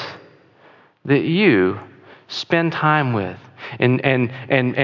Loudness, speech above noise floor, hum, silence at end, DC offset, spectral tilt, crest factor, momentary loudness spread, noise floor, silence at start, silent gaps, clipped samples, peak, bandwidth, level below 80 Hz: -18 LUFS; 33 dB; none; 0 s; under 0.1%; -7.5 dB/octave; 16 dB; 18 LU; -51 dBFS; 0 s; none; under 0.1%; -2 dBFS; 7.4 kHz; -56 dBFS